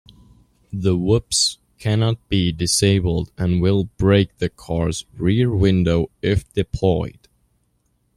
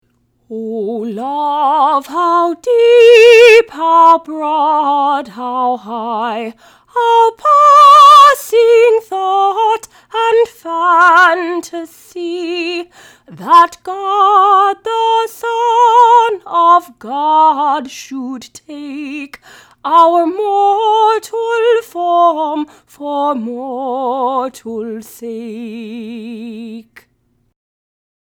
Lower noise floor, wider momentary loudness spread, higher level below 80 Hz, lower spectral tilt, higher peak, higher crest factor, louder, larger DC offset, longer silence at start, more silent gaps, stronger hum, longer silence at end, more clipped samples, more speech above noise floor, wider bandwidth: first, -66 dBFS vs -60 dBFS; second, 7 LU vs 20 LU; first, -38 dBFS vs -62 dBFS; first, -5.5 dB/octave vs -3 dB/octave; second, -4 dBFS vs 0 dBFS; about the same, 16 dB vs 12 dB; second, -20 LUFS vs -10 LUFS; neither; first, 0.7 s vs 0.5 s; neither; neither; second, 1.1 s vs 1.45 s; second, under 0.1% vs 0.2%; about the same, 47 dB vs 48 dB; second, 14 kHz vs 18.5 kHz